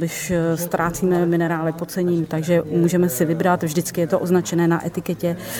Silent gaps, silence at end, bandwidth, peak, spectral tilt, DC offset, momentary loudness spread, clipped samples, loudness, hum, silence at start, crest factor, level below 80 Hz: none; 0 s; 19.5 kHz; -6 dBFS; -6 dB/octave; under 0.1%; 5 LU; under 0.1%; -20 LUFS; none; 0 s; 14 dB; -50 dBFS